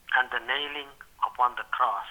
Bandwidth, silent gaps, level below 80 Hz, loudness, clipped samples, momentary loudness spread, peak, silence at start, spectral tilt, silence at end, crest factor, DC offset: over 20 kHz; none; -64 dBFS; -28 LUFS; under 0.1%; 9 LU; -10 dBFS; 0.1 s; -1.5 dB/octave; 0 s; 20 dB; under 0.1%